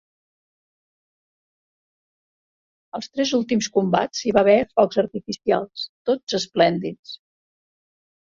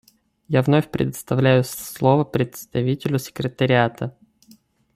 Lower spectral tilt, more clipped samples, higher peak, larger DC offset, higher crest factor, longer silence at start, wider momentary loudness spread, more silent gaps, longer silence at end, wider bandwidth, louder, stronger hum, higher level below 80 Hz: second, -4.5 dB/octave vs -6.5 dB/octave; neither; about the same, -2 dBFS vs -4 dBFS; neither; about the same, 22 dB vs 18 dB; first, 2.95 s vs 0.5 s; first, 16 LU vs 8 LU; first, 5.89-6.05 s, 6.23-6.27 s, 6.99-7.03 s vs none; first, 1.15 s vs 0.85 s; second, 7.6 kHz vs 15.5 kHz; about the same, -21 LUFS vs -21 LUFS; neither; second, -60 dBFS vs -54 dBFS